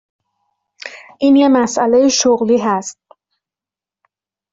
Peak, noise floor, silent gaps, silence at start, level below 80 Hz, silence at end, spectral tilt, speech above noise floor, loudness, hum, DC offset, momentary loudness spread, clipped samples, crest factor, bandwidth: -2 dBFS; -89 dBFS; none; 0.85 s; -58 dBFS; 1.6 s; -3.5 dB/octave; 77 dB; -13 LUFS; none; under 0.1%; 21 LU; under 0.1%; 14 dB; 7.8 kHz